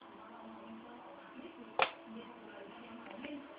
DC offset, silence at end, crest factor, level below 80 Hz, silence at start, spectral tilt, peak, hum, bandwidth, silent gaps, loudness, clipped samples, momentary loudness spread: under 0.1%; 0 s; 32 dB; -80 dBFS; 0 s; -1 dB/octave; -14 dBFS; none; 5 kHz; none; -44 LUFS; under 0.1%; 17 LU